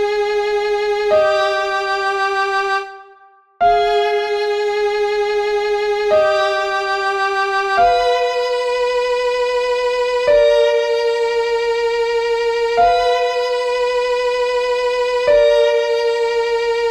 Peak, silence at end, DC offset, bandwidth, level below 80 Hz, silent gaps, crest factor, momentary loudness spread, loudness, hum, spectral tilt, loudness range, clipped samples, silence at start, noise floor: -4 dBFS; 0 s; under 0.1%; 11.5 kHz; -46 dBFS; none; 14 dB; 5 LU; -16 LUFS; none; -2 dB/octave; 2 LU; under 0.1%; 0 s; -48 dBFS